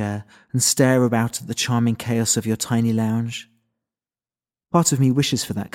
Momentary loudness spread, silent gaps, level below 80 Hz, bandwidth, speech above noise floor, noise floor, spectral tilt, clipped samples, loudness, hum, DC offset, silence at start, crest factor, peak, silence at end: 10 LU; none; -58 dBFS; 17 kHz; over 70 dB; under -90 dBFS; -4.5 dB/octave; under 0.1%; -20 LUFS; none; under 0.1%; 0 s; 18 dB; -2 dBFS; 0.05 s